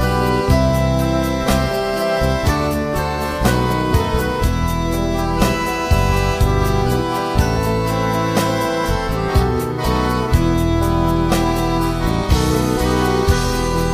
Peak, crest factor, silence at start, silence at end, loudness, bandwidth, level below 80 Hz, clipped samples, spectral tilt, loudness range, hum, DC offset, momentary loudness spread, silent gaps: -2 dBFS; 16 dB; 0 s; 0 s; -18 LUFS; 15.5 kHz; -24 dBFS; under 0.1%; -6 dB/octave; 1 LU; none; under 0.1%; 3 LU; none